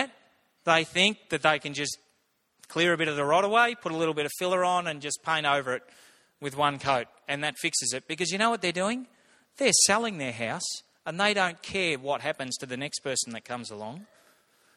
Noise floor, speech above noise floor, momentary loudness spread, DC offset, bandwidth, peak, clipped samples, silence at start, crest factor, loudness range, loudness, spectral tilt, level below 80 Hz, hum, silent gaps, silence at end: -72 dBFS; 44 dB; 13 LU; under 0.1%; 16.5 kHz; -6 dBFS; under 0.1%; 0 s; 24 dB; 4 LU; -27 LUFS; -2.5 dB/octave; -70 dBFS; none; none; 0.7 s